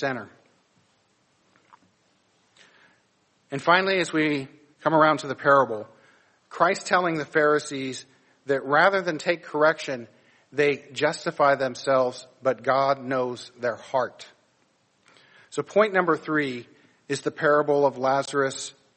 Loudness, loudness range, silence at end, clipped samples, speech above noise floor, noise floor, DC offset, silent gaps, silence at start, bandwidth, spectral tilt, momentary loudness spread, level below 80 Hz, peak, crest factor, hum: -24 LUFS; 5 LU; 0.25 s; under 0.1%; 43 dB; -67 dBFS; under 0.1%; none; 0 s; 8.8 kHz; -4.5 dB/octave; 14 LU; -72 dBFS; -4 dBFS; 20 dB; none